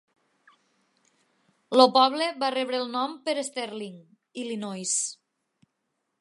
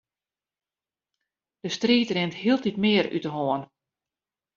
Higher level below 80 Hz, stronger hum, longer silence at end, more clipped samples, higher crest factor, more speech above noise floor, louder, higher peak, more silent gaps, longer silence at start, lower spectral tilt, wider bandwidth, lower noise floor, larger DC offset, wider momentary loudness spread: second, -84 dBFS vs -68 dBFS; neither; first, 1.05 s vs 0.9 s; neither; first, 26 dB vs 20 dB; second, 54 dB vs over 66 dB; about the same, -25 LUFS vs -25 LUFS; first, -2 dBFS vs -8 dBFS; neither; about the same, 1.7 s vs 1.65 s; second, -2 dB/octave vs -3.5 dB/octave; first, 11.5 kHz vs 7.4 kHz; second, -79 dBFS vs under -90 dBFS; neither; first, 18 LU vs 9 LU